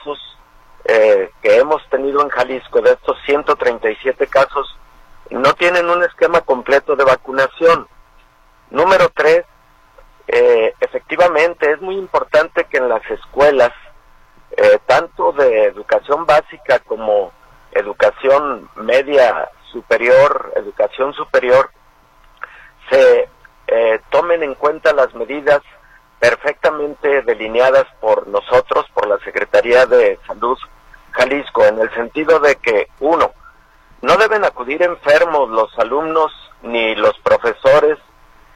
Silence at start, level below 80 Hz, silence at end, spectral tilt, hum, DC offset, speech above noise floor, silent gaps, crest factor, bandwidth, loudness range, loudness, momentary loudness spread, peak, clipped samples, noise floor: 0.05 s; -46 dBFS; 0.6 s; -4 dB/octave; none; under 0.1%; 34 dB; none; 14 dB; 10.5 kHz; 2 LU; -14 LUFS; 9 LU; -2 dBFS; under 0.1%; -49 dBFS